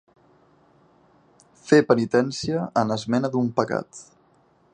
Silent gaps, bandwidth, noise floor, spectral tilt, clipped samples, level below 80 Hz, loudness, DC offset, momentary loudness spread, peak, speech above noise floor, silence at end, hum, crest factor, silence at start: none; 9.8 kHz; -60 dBFS; -6 dB/octave; under 0.1%; -62 dBFS; -22 LUFS; under 0.1%; 16 LU; -2 dBFS; 38 dB; 0.7 s; none; 22 dB; 1.65 s